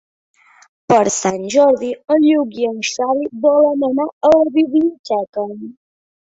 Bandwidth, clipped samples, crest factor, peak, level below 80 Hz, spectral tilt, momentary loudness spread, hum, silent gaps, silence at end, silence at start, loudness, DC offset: 8 kHz; under 0.1%; 16 dB; 0 dBFS; -58 dBFS; -4.5 dB/octave; 9 LU; none; 4.13-4.21 s, 4.99-5.04 s, 5.29-5.33 s; 0.5 s; 0.9 s; -15 LUFS; under 0.1%